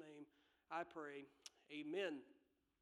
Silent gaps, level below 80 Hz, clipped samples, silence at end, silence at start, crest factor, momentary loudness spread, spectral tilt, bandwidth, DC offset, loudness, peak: none; under -90 dBFS; under 0.1%; 0.5 s; 0 s; 20 dB; 16 LU; -4 dB/octave; 12 kHz; under 0.1%; -51 LUFS; -32 dBFS